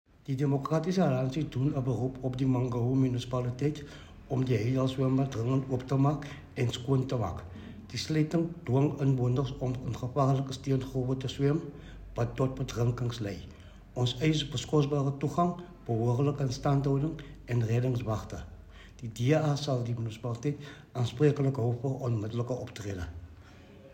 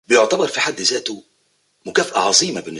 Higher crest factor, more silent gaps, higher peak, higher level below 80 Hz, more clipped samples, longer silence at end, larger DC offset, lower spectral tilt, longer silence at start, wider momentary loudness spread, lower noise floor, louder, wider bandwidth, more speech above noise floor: about the same, 18 dB vs 18 dB; neither; second, -12 dBFS vs 0 dBFS; first, -52 dBFS vs -64 dBFS; neither; about the same, 0 s vs 0 s; neither; first, -7 dB/octave vs -1.5 dB/octave; first, 0.3 s vs 0.1 s; about the same, 13 LU vs 14 LU; second, -52 dBFS vs -64 dBFS; second, -31 LUFS vs -17 LUFS; second, 9.2 kHz vs 11.5 kHz; second, 22 dB vs 45 dB